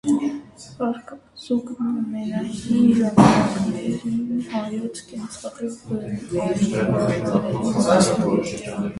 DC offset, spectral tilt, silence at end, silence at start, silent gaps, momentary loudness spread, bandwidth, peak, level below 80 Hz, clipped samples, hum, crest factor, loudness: under 0.1%; -6 dB/octave; 0 s; 0.05 s; none; 16 LU; 11.5 kHz; 0 dBFS; -50 dBFS; under 0.1%; none; 22 dB; -22 LUFS